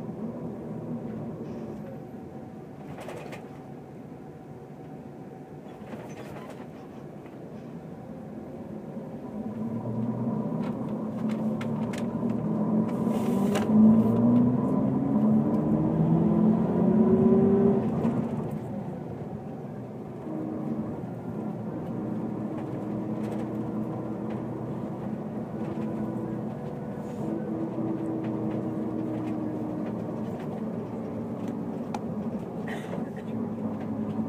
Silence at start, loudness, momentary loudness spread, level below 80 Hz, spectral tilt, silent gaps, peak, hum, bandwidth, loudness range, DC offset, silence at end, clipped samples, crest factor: 0 s; -29 LUFS; 19 LU; -58 dBFS; -9 dB/octave; none; -8 dBFS; none; 10.5 kHz; 18 LU; under 0.1%; 0 s; under 0.1%; 20 dB